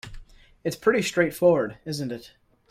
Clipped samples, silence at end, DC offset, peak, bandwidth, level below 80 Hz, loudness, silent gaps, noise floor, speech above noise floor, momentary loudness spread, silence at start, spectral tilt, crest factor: under 0.1%; 0.45 s; under 0.1%; -6 dBFS; 16 kHz; -52 dBFS; -24 LUFS; none; -44 dBFS; 20 dB; 14 LU; 0.05 s; -5 dB/octave; 20 dB